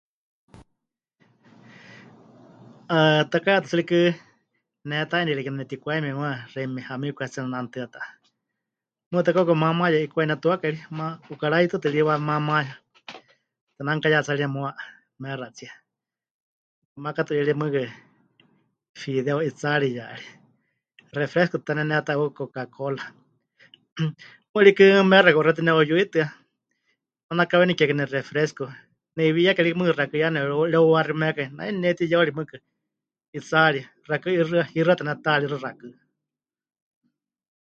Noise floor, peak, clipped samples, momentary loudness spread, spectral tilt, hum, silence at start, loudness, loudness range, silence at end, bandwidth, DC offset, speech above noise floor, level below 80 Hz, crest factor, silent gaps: -89 dBFS; 0 dBFS; under 0.1%; 16 LU; -6.5 dB/octave; none; 1.9 s; -22 LUFS; 10 LU; 1.75 s; 7.6 kHz; under 0.1%; 67 dB; -70 dBFS; 24 dB; 9.06-9.11 s, 13.61-13.67 s, 16.31-16.96 s, 18.89-18.94 s, 23.92-23.96 s, 24.49-24.54 s, 27.23-27.29 s, 33.28-33.33 s